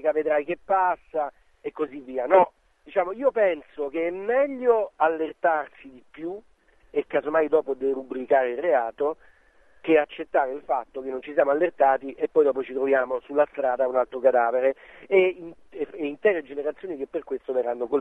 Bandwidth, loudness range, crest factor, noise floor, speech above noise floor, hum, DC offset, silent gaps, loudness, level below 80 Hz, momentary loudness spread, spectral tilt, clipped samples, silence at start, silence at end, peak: 3.8 kHz; 3 LU; 20 dB; -59 dBFS; 35 dB; none; 0.1%; none; -25 LUFS; -64 dBFS; 12 LU; -7 dB/octave; under 0.1%; 0 s; 0 s; -6 dBFS